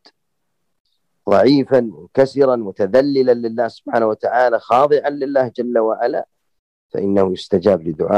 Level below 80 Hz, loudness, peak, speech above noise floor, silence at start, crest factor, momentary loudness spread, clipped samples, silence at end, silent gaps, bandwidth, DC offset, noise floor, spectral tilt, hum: -58 dBFS; -16 LUFS; -2 dBFS; 60 dB; 1.25 s; 14 dB; 8 LU; under 0.1%; 0 s; 6.59-6.89 s; 9.4 kHz; under 0.1%; -75 dBFS; -7.5 dB/octave; none